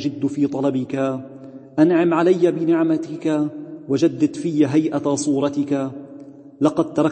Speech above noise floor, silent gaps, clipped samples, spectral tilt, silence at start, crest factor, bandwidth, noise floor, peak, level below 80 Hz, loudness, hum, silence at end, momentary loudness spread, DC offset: 21 dB; none; under 0.1%; -6.5 dB/octave; 0 s; 18 dB; 8.8 kHz; -40 dBFS; -2 dBFS; -66 dBFS; -20 LUFS; none; 0 s; 14 LU; under 0.1%